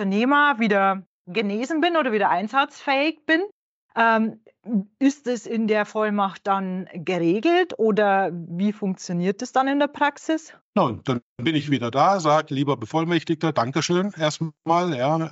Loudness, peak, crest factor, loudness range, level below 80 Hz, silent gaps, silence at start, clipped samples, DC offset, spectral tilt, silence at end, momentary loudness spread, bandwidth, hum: -22 LUFS; -8 dBFS; 14 dB; 2 LU; -72 dBFS; 1.06-1.25 s, 3.52-3.89 s, 10.61-10.73 s, 11.22-11.36 s; 0 s; under 0.1%; under 0.1%; -4 dB/octave; 0 s; 8 LU; 8 kHz; none